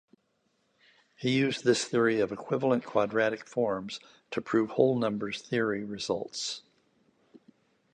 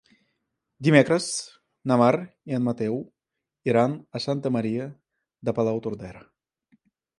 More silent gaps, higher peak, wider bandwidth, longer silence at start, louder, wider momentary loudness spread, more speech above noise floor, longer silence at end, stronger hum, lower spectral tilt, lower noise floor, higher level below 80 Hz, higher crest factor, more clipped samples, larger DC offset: neither; second, -8 dBFS vs -2 dBFS; second, 10 kHz vs 11.5 kHz; first, 1.2 s vs 0.8 s; second, -29 LUFS vs -25 LUFS; second, 10 LU vs 16 LU; second, 46 dB vs 62 dB; first, 1.35 s vs 1 s; neither; about the same, -5 dB/octave vs -6 dB/octave; second, -74 dBFS vs -85 dBFS; second, -70 dBFS vs -64 dBFS; about the same, 22 dB vs 24 dB; neither; neither